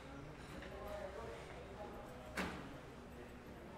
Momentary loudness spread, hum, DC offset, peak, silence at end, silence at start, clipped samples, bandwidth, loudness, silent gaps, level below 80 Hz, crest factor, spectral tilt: 9 LU; none; under 0.1%; -28 dBFS; 0 s; 0 s; under 0.1%; 16 kHz; -50 LUFS; none; -60 dBFS; 22 dB; -5 dB/octave